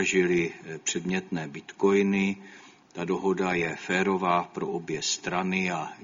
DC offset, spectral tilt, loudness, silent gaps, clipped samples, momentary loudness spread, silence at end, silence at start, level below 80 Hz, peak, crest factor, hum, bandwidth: under 0.1%; -4.5 dB/octave; -27 LUFS; none; under 0.1%; 10 LU; 0 s; 0 s; -64 dBFS; -10 dBFS; 18 dB; none; 7.6 kHz